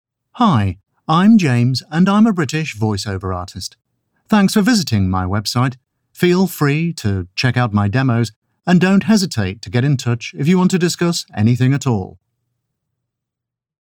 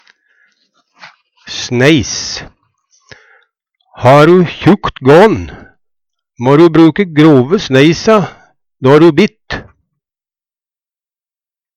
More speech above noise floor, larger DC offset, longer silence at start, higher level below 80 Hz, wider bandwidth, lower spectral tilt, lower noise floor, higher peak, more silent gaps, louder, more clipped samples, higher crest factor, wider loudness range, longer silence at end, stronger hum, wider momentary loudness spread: second, 68 dB vs over 82 dB; neither; second, 0.35 s vs 1.05 s; second, -56 dBFS vs -42 dBFS; first, 17 kHz vs 10.5 kHz; about the same, -6 dB/octave vs -6 dB/octave; second, -83 dBFS vs under -90 dBFS; about the same, -2 dBFS vs 0 dBFS; first, 8.36-8.42 s vs none; second, -16 LUFS vs -9 LUFS; second, under 0.1% vs 0.2%; about the same, 14 dB vs 12 dB; second, 2 LU vs 8 LU; second, 1.75 s vs 2.15 s; neither; second, 10 LU vs 17 LU